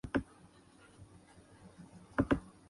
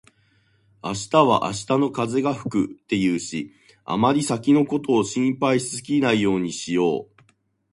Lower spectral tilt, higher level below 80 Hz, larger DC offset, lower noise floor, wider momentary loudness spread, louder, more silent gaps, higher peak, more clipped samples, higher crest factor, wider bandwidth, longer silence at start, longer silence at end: first, -7 dB/octave vs -5 dB/octave; about the same, -54 dBFS vs -58 dBFS; neither; about the same, -61 dBFS vs -62 dBFS; first, 27 LU vs 11 LU; second, -36 LUFS vs -22 LUFS; neither; second, -18 dBFS vs -2 dBFS; neither; about the same, 22 dB vs 20 dB; about the same, 11.5 kHz vs 11.5 kHz; second, 0.05 s vs 0.85 s; second, 0.2 s vs 0.7 s